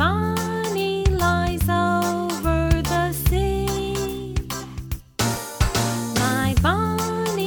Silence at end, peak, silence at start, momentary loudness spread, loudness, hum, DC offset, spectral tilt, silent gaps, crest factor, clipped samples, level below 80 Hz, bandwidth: 0 s; -6 dBFS; 0 s; 8 LU; -22 LUFS; none; under 0.1%; -5 dB/octave; none; 16 dB; under 0.1%; -30 dBFS; over 20 kHz